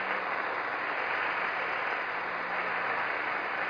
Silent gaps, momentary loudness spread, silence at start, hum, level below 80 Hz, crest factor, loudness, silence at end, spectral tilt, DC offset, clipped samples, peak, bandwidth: none; 2 LU; 0 s; none; -72 dBFS; 16 dB; -31 LUFS; 0 s; -4.5 dB/octave; under 0.1%; under 0.1%; -16 dBFS; 5.4 kHz